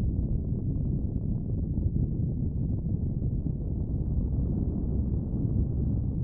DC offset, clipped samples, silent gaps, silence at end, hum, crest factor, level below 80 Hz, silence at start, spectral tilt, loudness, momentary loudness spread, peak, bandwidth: under 0.1%; under 0.1%; none; 0 s; none; 12 dB; -32 dBFS; 0 s; -17.5 dB/octave; -30 LUFS; 2 LU; -16 dBFS; 1.3 kHz